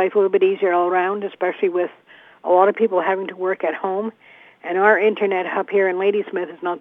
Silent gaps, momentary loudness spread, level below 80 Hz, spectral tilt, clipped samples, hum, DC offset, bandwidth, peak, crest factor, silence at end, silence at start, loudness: none; 10 LU; -82 dBFS; -8 dB/octave; under 0.1%; none; under 0.1%; 3.8 kHz; -2 dBFS; 18 dB; 0 s; 0 s; -19 LUFS